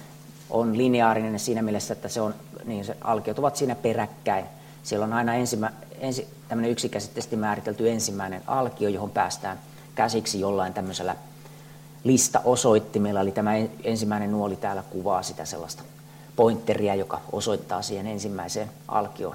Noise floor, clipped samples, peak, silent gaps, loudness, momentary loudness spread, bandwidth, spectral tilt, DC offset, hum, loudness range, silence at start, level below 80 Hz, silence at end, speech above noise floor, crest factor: -46 dBFS; under 0.1%; -6 dBFS; none; -26 LUFS; 14 LU; 16.5 kHz; -4.5 dB/octave; under 0.1%; none; 4 LU; 0 s; -62 dBFS; 0 s; 20 dB; 20 dB